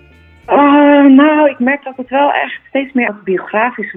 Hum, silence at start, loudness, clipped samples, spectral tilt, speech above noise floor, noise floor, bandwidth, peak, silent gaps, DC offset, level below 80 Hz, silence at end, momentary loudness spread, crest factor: none; 0.5 s; -11 LUFS; under 0.1%; -8.5 dB/octave; 20 dB; -35 dBFS; 3.8 kHz; 0 dBFS; none; under 0.1%; -54 dBFS; 0.05 s; 12 LU; 12 dB